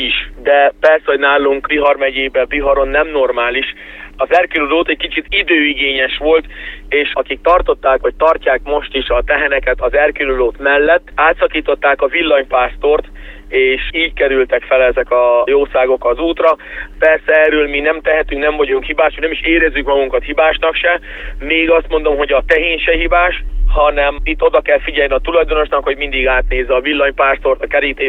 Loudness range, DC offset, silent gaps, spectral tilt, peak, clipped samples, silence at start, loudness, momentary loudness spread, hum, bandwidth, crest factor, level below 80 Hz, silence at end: 1 LU; under 0.1%; none; -6.5 dB/octave; 0 dBFS; under 0.1%; 0 s; -13 LUFS; 5 LU; none; 5.4 kHz; 14 dB; -26 dBFS; 0 s